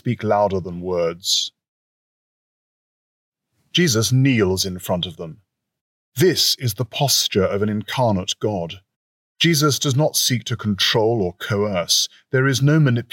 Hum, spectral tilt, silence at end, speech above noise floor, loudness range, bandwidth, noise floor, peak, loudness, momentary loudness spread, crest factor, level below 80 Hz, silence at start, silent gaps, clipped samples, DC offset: none; -4 dB/octave; 0.1 s; over 71 dB; 5 LU; 17 kHz; under -90 dBFS; -6 dBFS; -19 LUFS; 8 LU; 16 dB; -62 dBFS; 0.05 s; 1.68-3.32 s, 5.81-6.12 s, 8.96-9.35 s; under 0.1%; under 0.1%